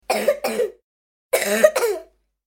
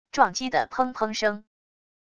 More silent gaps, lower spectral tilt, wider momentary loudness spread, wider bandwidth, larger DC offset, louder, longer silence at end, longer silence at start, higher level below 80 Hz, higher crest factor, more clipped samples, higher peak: first, 0.83-1.30 s vs none; about the same, -2 dB/octave vs -3 dB/octave; first, 10 LU vs 5 LU; first, 17 kHz vs 11 kHz; neither; first, -20 LUFS vs -25 LUFS; second, 0.45 s vs 0.75 s; about the same, 0.1 s vs 0.15 s; about the same, -62 dBFS vs -62 dBFS; about the same, 22 dB vs 22 dB; neither; first, 0 dBFS vs -4 dBFS